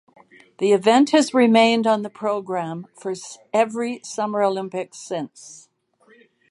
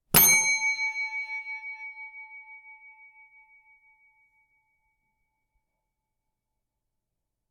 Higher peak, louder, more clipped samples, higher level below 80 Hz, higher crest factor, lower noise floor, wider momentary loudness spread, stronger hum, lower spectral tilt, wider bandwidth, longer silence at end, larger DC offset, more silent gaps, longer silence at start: about the same, -2 dBFS vs -4 dBFS; first, -20 LUFS vs -23 LUFS; neither; second, -76 dBFS vs -58 dBFS; second, 18 dB vs 28 dB; second, -57 dBFS vs -83 dBFS; second, 16 LU vs 27 LU; neither; first, -4.5 dB/octave vs -0.5 dB/octave; second, 11.5 kHz vs 17 kHz; second, 0.95 s vs 4.6 s; neither; neither; first, 0.6 s vs 0.15 s